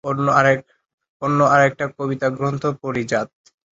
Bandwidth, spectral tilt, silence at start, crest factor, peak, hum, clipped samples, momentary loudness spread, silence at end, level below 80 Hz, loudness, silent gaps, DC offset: 8 kHz; -6.5 dB/octave; 0.05 s; 18 dB; 0 dBFS; none; under 0.1%; 10 LU; 0.5 s; -58 dBFS; -19 LUFS; 0.94-0.98 s, 1.09-1.20 s; under 0.1%